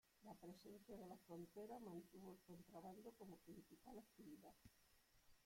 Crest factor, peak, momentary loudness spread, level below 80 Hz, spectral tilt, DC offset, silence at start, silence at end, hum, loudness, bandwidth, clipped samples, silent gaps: 16 dB; -46 dBFS; 7 LU; -82 dBFS; -6 dB/octave; under 0.1%; 0.05 s; 0 s; none; -62 LUFS; 16.5 kHz; under 0.1%; none